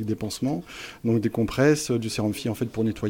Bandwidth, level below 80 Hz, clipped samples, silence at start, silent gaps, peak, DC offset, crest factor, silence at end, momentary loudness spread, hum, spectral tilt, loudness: 17.5 kHz; -50 dBFS; under 0.1%; 0 s; none; -8 dBFS; under 0.1%; 16 dB; 0 s; 9 LU; none; -5.5 dB/octave; -25 LUFS